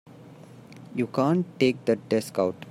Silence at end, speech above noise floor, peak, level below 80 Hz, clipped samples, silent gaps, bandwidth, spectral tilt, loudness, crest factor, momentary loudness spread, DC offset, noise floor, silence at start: 0 s; 22 dB; -8 dBFS; -70 dBFS; under 0.1%; none; 16 kHz; -6.5 dB/octave; -26 LUFS; 18 dB; 9 LU; under 0.1%; -47 dBFS; 0.2 s